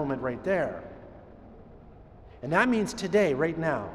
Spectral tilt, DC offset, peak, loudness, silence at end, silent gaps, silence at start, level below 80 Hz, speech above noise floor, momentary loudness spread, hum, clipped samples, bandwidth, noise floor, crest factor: -6 dB/octave; under 0.1%; -10 dBFS; -27 LUFS; 0 s; none; 0 s; -54 dBFS; 23 dB; 20 LU; none; under 0.1%; 13.5 kHz; -50 dBFS; 20 dB